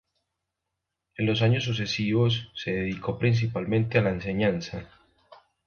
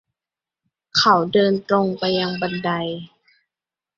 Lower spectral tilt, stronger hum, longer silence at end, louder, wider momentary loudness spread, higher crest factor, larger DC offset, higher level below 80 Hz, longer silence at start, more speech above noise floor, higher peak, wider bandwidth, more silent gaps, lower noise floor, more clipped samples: first, -6.5 dB/octave vs -5 dB/octave; neither; second, 0.3 s vs 0.9 s; second, -26 LUFS vs -19 LUFS; about the same, 8 LU vs 10 LU; about the same, 20 dB vs 20 dB; neither; first, -52 dBFS vs -62 dBFS; first, 1.2 s vs 0.95 s; second, 58 dB vs 70 dB; second, -8 dBFS vs -2 dBFS; second, 6.8 kHz vs 7.6 kHz; neither; second, -84 dBFS vs -89 dBFS; neither